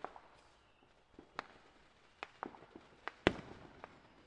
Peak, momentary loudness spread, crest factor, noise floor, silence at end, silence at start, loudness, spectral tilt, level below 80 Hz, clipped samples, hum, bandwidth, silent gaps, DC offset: -6 dBFS; 27 LU; 40 dB; -69 dBFS; 0.05 s; 0 s; -44 LUFS; -5.5 dB/octave; -64 dBFS; under 0.1%; none; 10 kHz; none; under 0.1%